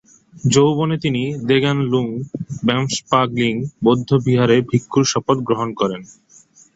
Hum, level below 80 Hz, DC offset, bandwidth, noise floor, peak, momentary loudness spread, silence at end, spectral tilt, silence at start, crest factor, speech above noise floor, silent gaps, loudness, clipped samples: none; -52 dBFS; under 0.1%; 8.2 kHz; -49 dBFS; -2 dBFS; 8 LU; 0.65 s; -5.5 dB/octave; 0.35 s; 16 dB; 32 dB; none; -18 LUFS; under 0.1%